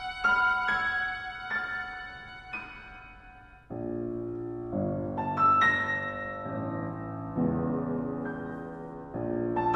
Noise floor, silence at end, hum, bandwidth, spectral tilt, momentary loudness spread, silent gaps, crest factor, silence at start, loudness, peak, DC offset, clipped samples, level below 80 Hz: -51 dBFS; 0 s; none; 9.4 kHz; -6.5 dB/octave; 16 LU; none; 18 dB; 0 s; -30 LUFS; -14 dBFS; under 0.1%; under 0.1%; -54 dBFS